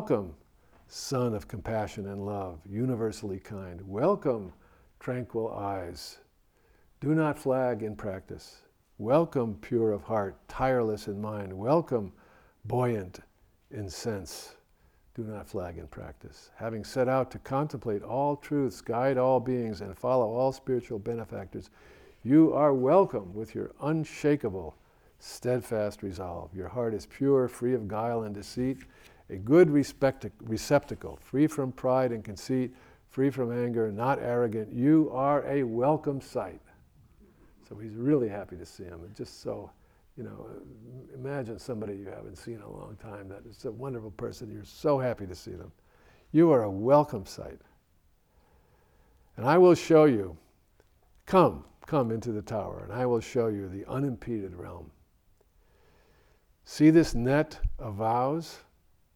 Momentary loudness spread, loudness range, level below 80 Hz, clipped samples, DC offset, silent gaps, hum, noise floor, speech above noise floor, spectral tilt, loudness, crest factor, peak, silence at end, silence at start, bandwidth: 20 LU; 10 LU; -52 dBFS; under 0.1%; under 0.1%; none; none; -66 dBFS; 37 dB; -7 dB/octave; -29 LUFS; 22 dB; -8 dBFS; 0.55 s; 0 s; 16 kHz